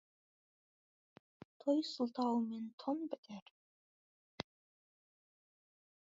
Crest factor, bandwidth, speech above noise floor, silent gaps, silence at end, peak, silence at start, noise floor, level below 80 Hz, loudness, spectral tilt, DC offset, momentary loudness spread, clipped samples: 24 dB; 7.4 kHz; over 51 dB; 2.73-2.78 s, 3.18-3.23 s, 3.42-4.38 s; 1.6 s; -18 dBFS; 1.65 s; under -90 dBFS; -84 dBFS; -40 LUFS; -4.5 dB/octave; under 0.1%; 14 LU; under 0.1%